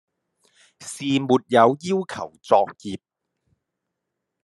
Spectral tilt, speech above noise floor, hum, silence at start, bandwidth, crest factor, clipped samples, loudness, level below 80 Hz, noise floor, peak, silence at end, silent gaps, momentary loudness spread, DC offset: -5.5 dB/octave; 60 dB; none; 0.8 s; 12 kHz; 22 dB; under 0.1%; -21 LUFS; -72 dBFS; -81 dBFS; -2 dBFS; 1.45 s; none; 19 LU; under 0.1%